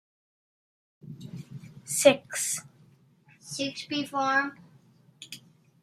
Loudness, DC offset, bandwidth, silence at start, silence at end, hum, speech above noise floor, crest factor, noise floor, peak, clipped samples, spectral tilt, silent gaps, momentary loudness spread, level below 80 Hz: -27 LUFS; under 0.1%; 15.5 kHz; 1.05 s; 0.45 s; none; 33 dB; 26 dB; -60 dBFS; -6 dBFS; under 0.1%; -2.5 dB/octave; none; 24 LU; -76 dBFS